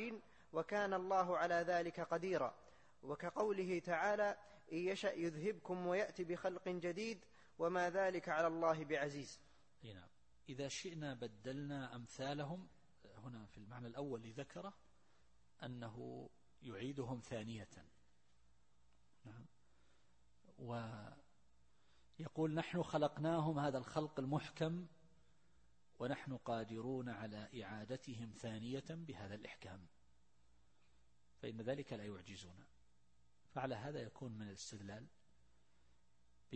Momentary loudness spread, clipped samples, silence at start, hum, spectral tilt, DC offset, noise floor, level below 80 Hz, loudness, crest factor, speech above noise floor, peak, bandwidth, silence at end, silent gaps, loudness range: 17 LU; under 0.1%; 0 s; none; -6 dB/octave; under 0.1%; -78 dBFS; -76 dBFS; -44 LUFS; 22 dB; 35 dB; -24 dBFS; 8.4 kHz; 0 s; none; 12 LU